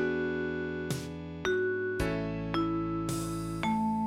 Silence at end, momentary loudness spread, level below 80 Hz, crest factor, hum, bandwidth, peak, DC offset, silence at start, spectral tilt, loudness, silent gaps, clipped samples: 0 s; 5 LU; -50 dBFS; 18 dB; none; 16 kHz; -14 dBFS; under 0.1%; 0 s; -6 dB/octave; -33 LUFS; none; under 0.1%